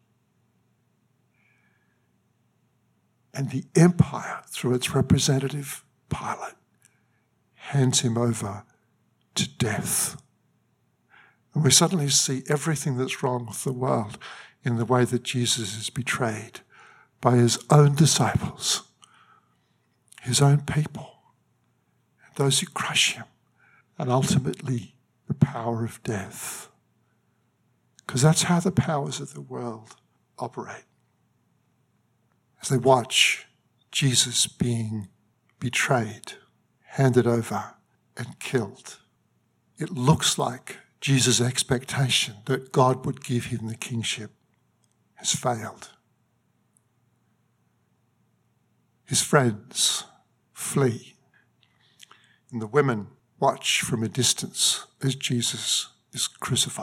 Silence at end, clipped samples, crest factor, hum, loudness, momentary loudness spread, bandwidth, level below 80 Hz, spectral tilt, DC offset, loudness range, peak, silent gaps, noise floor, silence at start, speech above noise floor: 0 s; under 0.1%; 24 dB; none; -24 LUFS; 17 LU; 16.5 kHz; -58 dBFS; -4 dB/octave; under 0.1%; 7 LU; -4 dBFS; none; -69 dBFS; 3.35 s; 45 dB